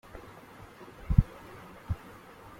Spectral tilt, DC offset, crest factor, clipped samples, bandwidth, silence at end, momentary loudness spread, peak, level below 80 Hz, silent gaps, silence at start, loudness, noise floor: -8.5 dB/octave; under 0.1%; 28 dB; under 0.1%; 16 kHz; 0.65 s; 22 LU; -4 dBFS; -36 dBFS; none; 0.15 s; -32 LUFS; -50 dBFS